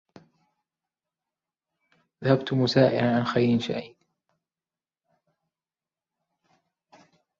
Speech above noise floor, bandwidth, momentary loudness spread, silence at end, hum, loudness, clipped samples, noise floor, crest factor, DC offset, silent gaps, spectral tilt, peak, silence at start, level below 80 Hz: over 67 dB; 7.6 kHz; 11 LU; 3.55 s; none; -24 LUFS; under 0.1%; under -90 dBFS; 24 dB; under 0.1%; none; -7 dB/octave; -6 dBFS; 2.2 s; -66 dBFS